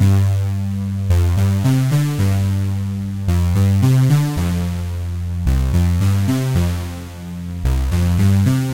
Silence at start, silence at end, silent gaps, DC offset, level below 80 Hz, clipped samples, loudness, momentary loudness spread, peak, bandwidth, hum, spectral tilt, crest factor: 0 s; 0 s; none; 0.4%; -26 dBFS; under 0.1%; -18 LUFS; 9 LU; -4 dBFS; 16.5 kHz; none; -7 dB/octave; 12 dB